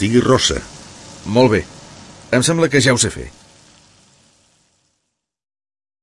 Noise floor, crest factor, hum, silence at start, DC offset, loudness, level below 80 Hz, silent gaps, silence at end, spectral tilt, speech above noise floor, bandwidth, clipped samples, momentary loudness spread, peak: -74 dBFS; 18 dB; none; 0 s; under 0.1%; -15 LUFS; -42 dBFS; none; 2.75 s; -4 dB/octave; 59 dB; 11.5 kHz; under 0.1%; 23 LU; -2 dBFS